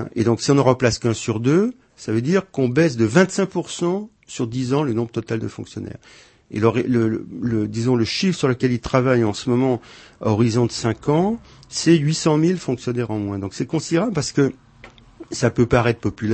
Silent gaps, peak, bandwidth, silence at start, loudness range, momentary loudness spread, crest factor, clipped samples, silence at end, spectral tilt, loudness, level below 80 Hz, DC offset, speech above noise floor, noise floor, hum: none; 0 dBFS; 8.8 kHz; 0 s; 4 LU; 10 LU; 20 dB; under 0.1%; 0 s; -6 dB/octave; -20 LUFS; -48 dBFS; under 0.1%; 27 dB; -46 dBFS; none